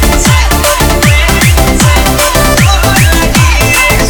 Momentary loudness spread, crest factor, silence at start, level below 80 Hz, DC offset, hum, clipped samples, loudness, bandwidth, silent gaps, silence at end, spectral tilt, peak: 1 LU; 6 dB; 0 s; -12 dBFS; under 0.1%; none; 0.7%; -7 LUFS; over 20 kHz; none; 0 s; -4 dB/octave; 0 dBFS